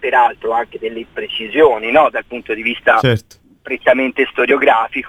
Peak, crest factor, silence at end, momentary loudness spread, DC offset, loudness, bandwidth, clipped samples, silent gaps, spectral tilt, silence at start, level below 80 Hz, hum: 0 dBFS; 14 dB; 0 s; 12 LU; under 0.1%; -15 LUFS; 13.5 kHz; under 0.1%; none; -6.5 dB/octave; 0 s; -50 dBFS; none